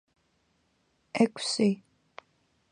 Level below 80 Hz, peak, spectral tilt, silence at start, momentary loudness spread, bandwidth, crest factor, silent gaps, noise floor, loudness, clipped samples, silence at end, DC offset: -76 dBFS; -10 dBFS; -4.5 dB/octave; 1.15 s; 12 LU; 11 kHz; 22 dB; none; -72 dBFS; -28 LUFS; under 0.1%; 0.95 s; under 0.1%